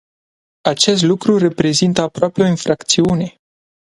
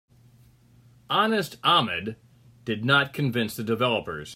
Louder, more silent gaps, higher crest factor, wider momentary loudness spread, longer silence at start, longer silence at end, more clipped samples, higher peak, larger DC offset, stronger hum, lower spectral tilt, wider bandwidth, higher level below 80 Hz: first, -15 LUFS vs -24 LUFS; neither; about the same, 16 dB vs 20 dB; second, 7 LU vs 10 LU; second, 0.65 s vs 1.1 s; first, 0.65 s vs 0 s; neither; first, 0 dBFS vs -8 dBFS; neither; neither; about the same, -4.5 dB/octave vs -5 dB/octave; second, 11.5 kHz vs 16 kHz; first, -50 dBFS vs -64 dBFS